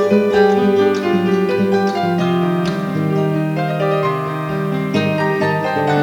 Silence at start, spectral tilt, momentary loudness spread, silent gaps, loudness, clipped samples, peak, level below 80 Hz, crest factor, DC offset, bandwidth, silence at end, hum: 0 s; -7.5 dB/octave; 6 LU; none; -16 LUFS; under 0.1%; -2 dBFS; -54 dBFS; 14 dB; under 0.1%; 18.5 kHz; 0 s; none